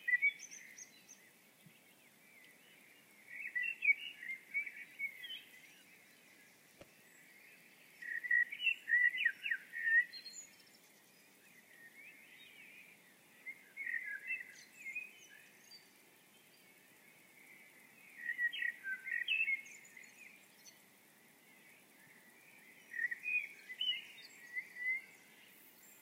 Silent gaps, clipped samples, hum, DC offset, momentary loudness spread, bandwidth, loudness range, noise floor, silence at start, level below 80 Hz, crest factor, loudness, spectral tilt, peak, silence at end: none; under 0.1%; none; under 0.1%; 27 LU; 16 kHz; 18 LU; -66 dBFS; 0 s; under -90 dBFS; 22 dB; -37 LUFS; 1 dB/octave; -22 dBFS; 0.05 s